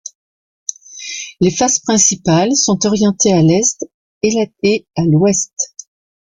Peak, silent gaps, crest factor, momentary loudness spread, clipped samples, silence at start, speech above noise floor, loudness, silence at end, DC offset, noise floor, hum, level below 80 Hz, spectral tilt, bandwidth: 0 dBFS; 0.15-0.66 s, 3.94-4.21 s; 14 dB; 16 LU; under 0.1%; 0.05 s; over 77 dB; -14 LUFS; 0.55 s; under 0.1%; under -90 dBFS; none; -50 dBFS; -4 dB/octave; 10 kHz